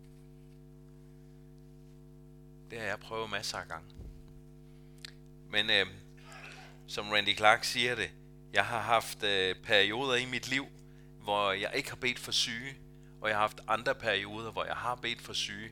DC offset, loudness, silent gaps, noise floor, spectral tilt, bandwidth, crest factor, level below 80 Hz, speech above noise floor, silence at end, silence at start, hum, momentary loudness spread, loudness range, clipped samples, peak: under 0.1%; -31 LUFS; none; -54 dBFS; -2.5 dB/octave; 19 kHz; 28 dB; -60 dBFS; 21 dB; 0 s; 0 s; 50 Hz at -55 dBFS; 22 LU; 12 LU; under 0.1%; -6 dBFS